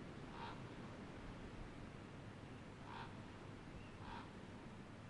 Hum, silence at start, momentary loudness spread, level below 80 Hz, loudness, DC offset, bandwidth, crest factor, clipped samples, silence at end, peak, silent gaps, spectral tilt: none; 0 s; 4 LU; -64 dBFS; -54 LUFS; under 0.1%; 11 kHz; 14 dB; under 0.1%; 0 s; -40 dBFS; none; -6 dB/octave